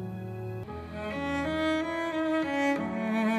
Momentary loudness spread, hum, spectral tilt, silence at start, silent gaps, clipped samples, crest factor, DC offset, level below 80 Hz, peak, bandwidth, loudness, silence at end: 10 LU; none; -6 dB/octave; 0 s; none; under 0.1%; 12 dB; under 0.1%; -54 dBFS; -18 dBFS; 14 kHz; -31 LUFS; 0 s